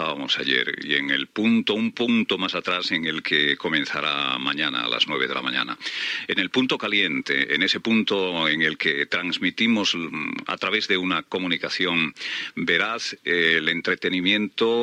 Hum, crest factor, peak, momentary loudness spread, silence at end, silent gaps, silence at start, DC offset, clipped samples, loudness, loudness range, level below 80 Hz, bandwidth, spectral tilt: none; 18 dB; -6 dBFS; 5 LU; 0 s; none; 0 s; under 0.1%; under 0.1%; -22 LUFS; 2 LU; -70 dBFS; 10.5 kHz; -4 dB/octave